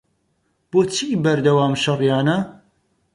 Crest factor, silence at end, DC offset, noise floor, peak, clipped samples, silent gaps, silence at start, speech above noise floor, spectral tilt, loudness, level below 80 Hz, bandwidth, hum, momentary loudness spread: 16 dB; 0.65 s; under 0.1%; -67 dBFS; -4 dBFS; under 0.1%; none; 0.75 s; 50 dB; -5.5 dB/octave; -19 LUFS; -58 dBFS; 11.5 kHz; none; 5 LU